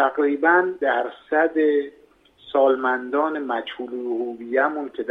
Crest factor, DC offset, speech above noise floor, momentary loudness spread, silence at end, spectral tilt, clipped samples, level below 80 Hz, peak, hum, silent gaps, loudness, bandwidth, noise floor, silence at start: 18 dB; under 0.1%; 30 dB; 10 LU; 0 s; -6 dB/octave; under 0.1%; -70 dBFS; -4 dBFS; none; none; -22 LUFS; 4.1 kHz; -51 dBFS; 0 s